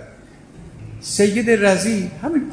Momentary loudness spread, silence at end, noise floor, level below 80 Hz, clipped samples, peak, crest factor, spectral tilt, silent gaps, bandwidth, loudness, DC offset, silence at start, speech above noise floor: 19 LU; 0 s; -43 dBFS; -48 dBFS; under 0.1%; -4 dBFS; 16 dB; -4.5 dB/octave; none; 10.5 kHz; -18 LUFS; under 0.1%; 0 s; 26 dB